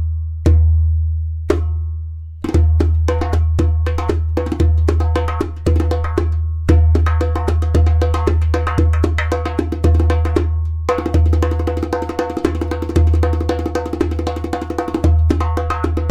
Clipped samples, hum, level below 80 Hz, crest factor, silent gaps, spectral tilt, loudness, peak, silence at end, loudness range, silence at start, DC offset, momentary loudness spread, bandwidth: under 0.1%; none; -18 dBFS; 14 dB; none; -8 dB/octave; -17 LUFS; -2 dBFS; 0 s; 2 LU; 0 s; under 0.1%; 7 LU; 8.2 kHz